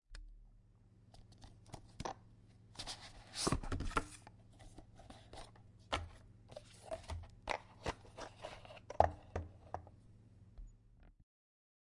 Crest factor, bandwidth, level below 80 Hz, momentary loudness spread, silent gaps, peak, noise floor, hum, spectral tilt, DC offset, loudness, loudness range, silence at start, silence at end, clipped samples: 34 dB; 11.5 kHz; -56 dBFS; 24 LU; none; -12 dBFS; -66 dBFS; none; -4 dB/octave; under 0.1%; -44 LUFS; 7 LU; 0.1 s; 0.8 s; under 0.1%